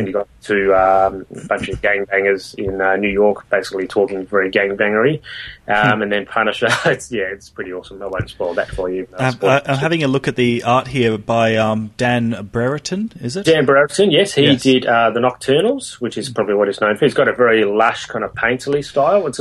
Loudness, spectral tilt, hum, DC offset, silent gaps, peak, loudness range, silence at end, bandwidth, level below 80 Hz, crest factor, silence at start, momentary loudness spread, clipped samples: -16 LUFS; -5 dB/octave; none; under 0.1%; none; 0 dBFS; 4 LU; 0 s; 12.5 kHz; -44 dBFS; 16 dB; 0 s; 10 LU; under 0.1%